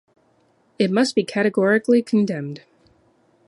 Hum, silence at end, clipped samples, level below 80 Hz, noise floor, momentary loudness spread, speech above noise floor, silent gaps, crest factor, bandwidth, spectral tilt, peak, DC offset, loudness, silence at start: none; 0.9 s; under 0.1%; -68 dBFS; -61 dBFS; 12 LU; 42 dB; none; 16 dB; 11.5 kHz; -6 dB/octave; -6 dBFS; under 0.1%; -20 LUFS; 0.8 s